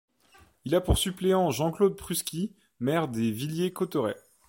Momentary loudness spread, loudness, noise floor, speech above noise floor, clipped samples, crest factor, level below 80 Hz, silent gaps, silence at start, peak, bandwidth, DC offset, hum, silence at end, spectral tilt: 8 LU; -28 LUFS; -60 dBFS; 33 dB; under 0.1%; 20 dB; -42 dBFS; none; 0.65 s; -10 dBFS; 16.5 kHz; under 0.1%; none; 0.3 s; -5 dB/octave